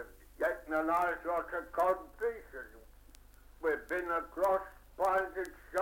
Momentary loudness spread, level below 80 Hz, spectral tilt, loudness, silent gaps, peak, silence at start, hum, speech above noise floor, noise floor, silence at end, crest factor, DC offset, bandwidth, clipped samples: 15 LU; -58 dBFS; -5 dB/octave; -34 LUFS; none; -18 dBFS; 0 s; 50 Hz at -60 dBFS; 23 dB; -57 dBFS; 0 s; 16 dB; under 0.1%; 17 kHz; under 0.1%